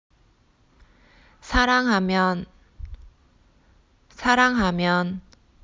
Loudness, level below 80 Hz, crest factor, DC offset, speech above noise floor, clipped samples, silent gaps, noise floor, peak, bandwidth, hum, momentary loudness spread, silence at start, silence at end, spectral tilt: -21 LUFS; -40 dBFS; 22 dB; under 0.1%; 39 dB; under 0.1%; none; -60 dBFS; -4 dBFS; 7.6 kHz; none; 24 LU; 1.45 s; 0.45 s; -5 dB/octave